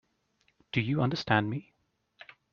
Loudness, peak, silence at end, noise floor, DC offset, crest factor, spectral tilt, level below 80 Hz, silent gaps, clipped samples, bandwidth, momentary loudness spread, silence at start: -30 LUFS; -8 dBFS; 0.9 s; -73 dBFS; under 0.1%; 26 dB; -4.5 dB/octave; -64 dBFS; none; under 0.1%; 7 kHz; 9 LU; 0.75 s